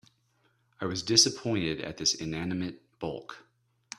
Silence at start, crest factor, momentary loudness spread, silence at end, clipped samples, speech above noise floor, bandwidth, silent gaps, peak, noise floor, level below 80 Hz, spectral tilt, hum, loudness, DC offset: 0.8 s; 26 dB; 17 LU; 0.6 s; under 0.1%; 41 dB; 14.5 kHz; none; -6 dBFS; -71 dBFS; -62 dBFS; -2.5 dB/octave; none; -28 LUFS; under 0.1%